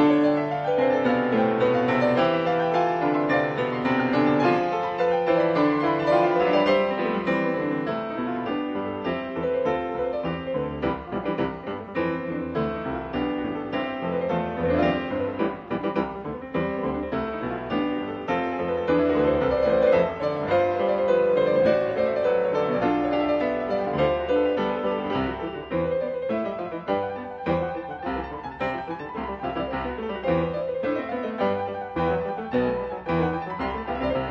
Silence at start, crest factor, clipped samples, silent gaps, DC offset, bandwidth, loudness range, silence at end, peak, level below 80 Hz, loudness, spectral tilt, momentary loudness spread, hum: 0 s; 16 dB; under 0.1%; none; under 0.1%; 6.6 kHz; 7 LU; 0 s; -8 dBFS; -48 dBFS; -25 LUFS; -8 dB/octave; 9 LU; none